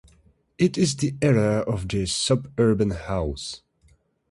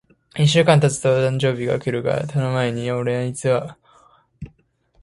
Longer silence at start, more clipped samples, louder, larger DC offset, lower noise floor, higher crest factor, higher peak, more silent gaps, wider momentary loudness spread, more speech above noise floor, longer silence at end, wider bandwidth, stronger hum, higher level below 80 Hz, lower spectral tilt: first, 0.6 s vs 0.35 s; neither; second, -23 LUFS vs -19 LUFS; neither; about the same, -61 dBFS vs -61 dBFS; about the same, 18 dB vs 20 dB; second, -8 dBFS vs 0 dBFS; neither; second, 9 LU vs 21 LU; second, 38 dB vs 42 dB; first, 0.75 s vs 0.55 s; about the same, 11.5 kHz vs 11.5 kHz; neither; first, -42 dBFS vs -54 dBFS; about the same, -5.5 dB/octave vs -5.5 dB/octave